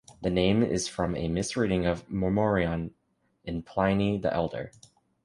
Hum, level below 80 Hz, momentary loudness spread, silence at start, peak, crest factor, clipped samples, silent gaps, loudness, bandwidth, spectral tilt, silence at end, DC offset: none; -46 dBFS; 12 LU; 0.1 s; -10 dBFS; 18 dB; under 0.1%; none; -28 LUFS; 11.5 kHz; -6 dB/octave; 0.55 s; under 0.1%